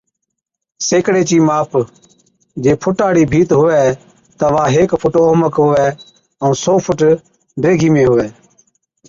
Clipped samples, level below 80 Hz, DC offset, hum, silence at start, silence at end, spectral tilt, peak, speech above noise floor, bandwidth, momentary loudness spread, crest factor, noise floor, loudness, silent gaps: under 0.1%; -44 dBFS; under 0.1%; none; 0.8 s; 0.75 s; -6 dB/octave; -2 dBFS; 65 dB; 7.6 kHz; 8 LU; 12 dB; -77 dBFS; -13 LUFS; none